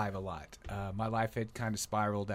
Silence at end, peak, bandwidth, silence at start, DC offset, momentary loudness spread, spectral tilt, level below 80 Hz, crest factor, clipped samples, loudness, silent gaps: 0 s; -20 dBFS; 16 kHz; 0 s; under 0.1%; 10 LU; -5.5 dB/octave; -54 dBFS; 16 dB; under 0.1%; -37 LUFS; none